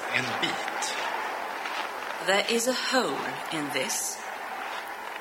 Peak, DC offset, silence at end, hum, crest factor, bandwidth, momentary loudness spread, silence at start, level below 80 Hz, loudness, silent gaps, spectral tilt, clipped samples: -10 dBFS; under 0.1%; 0 s; none; 20 dB; 16.5 kHz; 10 LU; 0 s; -74 dBFS; -29 LUFS; none; -1.5 dB/octave; under 0.1%